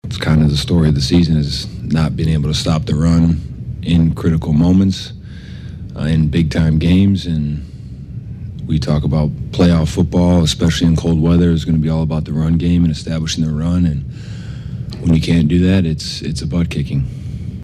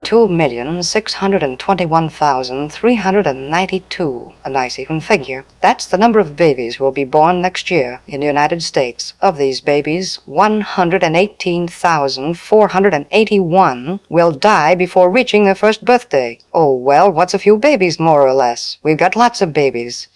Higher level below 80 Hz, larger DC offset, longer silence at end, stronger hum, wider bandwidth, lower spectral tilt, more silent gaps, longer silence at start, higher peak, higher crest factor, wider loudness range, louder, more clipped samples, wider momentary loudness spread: first, -28 dBFS vs -50 dBFS; neither; about the same, 0 s vs 0.1 s; neither; about the same, 11 kHz vs 12 kHz; first, -7 dB/octave vs -5 dB/octave; neither; about the same, 0.05 s vs 0 s; second, -4 dBFS vs 0 dBFS; about the same, 12 dB vs 14 dB; about the same, 3 LU vs 4 LU; about the same, -15 LUFS vs -14 LUFS; neither; first, 15 LU vs 8 LU